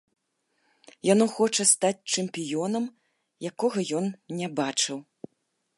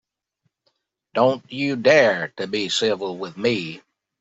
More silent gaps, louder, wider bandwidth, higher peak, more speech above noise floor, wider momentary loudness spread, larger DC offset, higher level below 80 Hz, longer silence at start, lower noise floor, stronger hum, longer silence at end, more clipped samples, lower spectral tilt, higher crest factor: neither; second, -26 LUFS vs -21 LUFS; first, 11.5 kHz vs 8.2 kHz; second, -6 dBFS vs -2 dBFS; about the same, 50 dB vs 53 dB; about the same, 13 LU vs 13 LU; neither; second, -78 dBFS vs -68 dBFS; about the same, 1.05 s vs 1.15 s; about the same, -76 dBFS vs -73 dBFS; neither; first, 0.75 s vs 0.4 s; neither; about the same, -3 dB/octave vs -4 dB/octave; about the same, 22 dB vs 20 dB